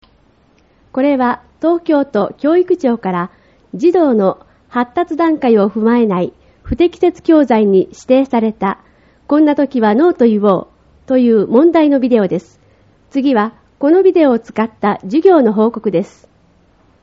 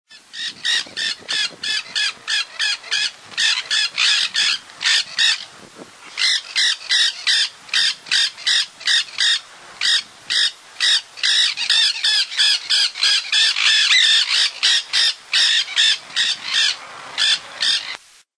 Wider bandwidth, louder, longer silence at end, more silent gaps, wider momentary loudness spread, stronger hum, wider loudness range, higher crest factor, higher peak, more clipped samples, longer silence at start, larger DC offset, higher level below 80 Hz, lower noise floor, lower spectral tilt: second, 7.6 kHz vs 11 kHz; first, -13 LUFS vs -16 LUFS; first, 0.95 s vs 0.4 s; neither; first, 10 LU vs 7 LU; neither; about the same, 3 LU vs 4 LU; about the same, 14 dB vs 16 dB; first, 0 dBFS vs -4 dBFS; neither; first, 0.95 s vs 0.1 s; neither; first, -46 dBFS vs -74 dBFS; first, -52 dBFS vs -41 dBFS; first, -6 dB/octave vs 3.5 dB/octave